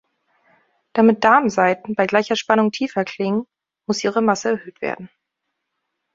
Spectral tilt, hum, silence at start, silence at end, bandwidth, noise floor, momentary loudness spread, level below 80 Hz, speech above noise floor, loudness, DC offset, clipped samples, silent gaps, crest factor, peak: -5 dB/octave; none; 0.95 s; 1.1 s; 7.6 kHz; -78 dBFS; 13 LU; -62 dBFS; 59 dB; -19 LUFS; under 0.1%; under 0.1%; none; 20 dB; 0 dBFS